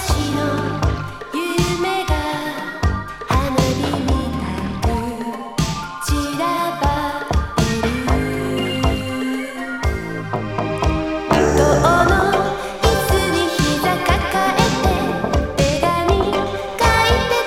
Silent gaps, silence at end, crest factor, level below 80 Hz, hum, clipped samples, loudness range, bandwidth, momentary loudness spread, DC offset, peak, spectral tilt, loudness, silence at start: none; 0 s; 18 dB; -26 dBFS; none; under 0.1%; 5 LU; 16.5 kHz; 9 LU; under 0.1%; 0 dBFS; -5 dB/octave; -19 LUFS; 0 s